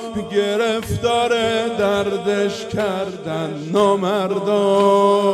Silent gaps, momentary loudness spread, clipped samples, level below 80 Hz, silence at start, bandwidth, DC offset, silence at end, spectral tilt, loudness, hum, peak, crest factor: none; 8 LU; under 0.1%; -50 dBFS; 0 s; 13.5 kHz; under 0.1%; 0 s; -5 dB/octave; -18 LUFS; none; -4 dBFS; 14 dB